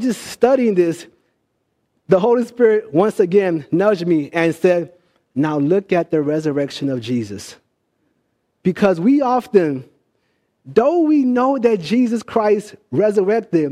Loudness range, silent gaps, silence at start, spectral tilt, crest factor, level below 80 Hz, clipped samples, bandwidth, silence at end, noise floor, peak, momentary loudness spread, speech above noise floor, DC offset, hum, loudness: 4 LU; none; 0 s; -7 dB/octave; 16 dB; -62 dBFS; under 0.1%; 14.5 kHz; 0 s; -69 dBFS; -2 dBFS; 8 LU; 53 dB; under 0.1%; none; -17 LUFS